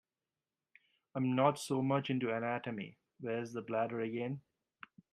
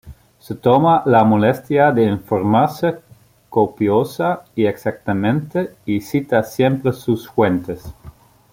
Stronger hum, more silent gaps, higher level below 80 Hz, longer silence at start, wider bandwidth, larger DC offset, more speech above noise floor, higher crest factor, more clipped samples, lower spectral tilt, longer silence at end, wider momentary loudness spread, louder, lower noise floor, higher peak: neither; neither; second, -80 dBFS vs -50 dBFS; first, 1.15 s vs 0.05 s; about the same, 15 kHz vs 16.5 kHz; neither; first, over 54 dB vs 28 dB; first, 22 dB vs 16 dB; neither; about the same, -6.5 dB/octave vs -7.5 dB/octave; first, 0.7 s vs 0.45 s; first, 16 LU vs 10 LU; second, -36 LUFS vs -17 LUFS; first, under -90 dBFS vs -45 dBFS; second, -16 dBFS vs -2 dBFS